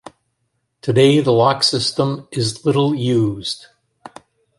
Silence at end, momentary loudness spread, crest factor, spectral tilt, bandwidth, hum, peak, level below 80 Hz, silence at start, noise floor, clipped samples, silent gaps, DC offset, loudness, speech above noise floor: 1 s; 12 LU; 16 dB; -5.5 dB/octave; 11.5 kHz; none; -2 dBFS; -56 dBFS; 0.85 s; -70 dBFS; under 0.1%; none; under 0.1%; -17 LUFS; 54 dB